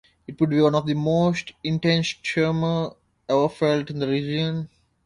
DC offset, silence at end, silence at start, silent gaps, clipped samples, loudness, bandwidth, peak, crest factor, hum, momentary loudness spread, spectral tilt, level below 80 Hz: under 0.1%; 0.4 s; 0.3 s; none; under 0.1%; -23 LUFS; 10.5 kHz; -6 dBFS; 16 dB; none; 10 LU; -6.5 dB/octave; -56 dBFS